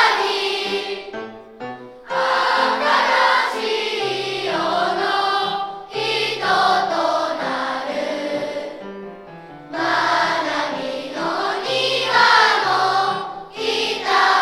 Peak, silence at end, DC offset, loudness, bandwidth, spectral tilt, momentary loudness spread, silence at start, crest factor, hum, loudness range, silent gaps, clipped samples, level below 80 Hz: 0 dBFS; 0 s; under 0.1%; -19 LUFS; 15 kHz; -2.5 dB/octave; 17 LU; 0 s; 20 dB; none; 5 LU; none; under 0.1%; -62 dBFS